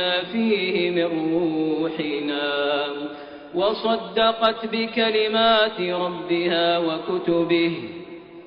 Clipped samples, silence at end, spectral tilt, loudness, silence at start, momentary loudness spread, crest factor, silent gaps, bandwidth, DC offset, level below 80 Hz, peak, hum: under 0.1%; 0 s; -2.5 dB/octave; -22 LUFS; 0 s; 10 LU; 16 dB; none; 5.4 kHz; under 0.1%; -60 dBFS; -6 dBFS; none